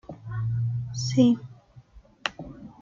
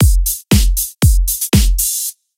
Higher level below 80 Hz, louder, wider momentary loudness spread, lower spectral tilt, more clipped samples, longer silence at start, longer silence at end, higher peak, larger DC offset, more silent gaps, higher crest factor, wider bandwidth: second, -54 dBFS vs -16 dBFS; second, -27 LUFS vs -14 LUFS; first, 21 LU vs 4 LU; first, -6 dB/octave vs -4 dB/octave; neither; about the same, 0.1 s vs 0 s; second, 0.1 s vs 0.25 s; second, -6 dBFS vs 0 dBFS; neither; neither; first, 22 dB vs 12 dB; second, 7.6 kHz vs 17 kHz